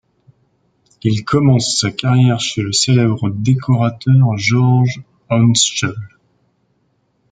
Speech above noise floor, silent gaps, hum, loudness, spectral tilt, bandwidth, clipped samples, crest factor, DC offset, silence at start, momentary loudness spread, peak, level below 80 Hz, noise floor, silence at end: 49 dB; none; none; -14 LUFS; -5 dB/octave; 9.4 kHz; under 0.1%; 14 dB; under 0.1%; 1.05 s; 7 LU; -2 dBFS; -52 dBFS; -62 dBFS; 1.25 s